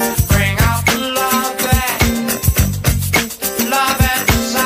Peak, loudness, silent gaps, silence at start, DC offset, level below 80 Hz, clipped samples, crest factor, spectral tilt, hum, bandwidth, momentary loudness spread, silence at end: 0 dBFS; -15 LUFS; none; 0 s; under 0.1%; -24 dBFS; under 0.1%; 14 dB; -4 dB/octave; none; 15.5 kHz; 3 LU; 0 s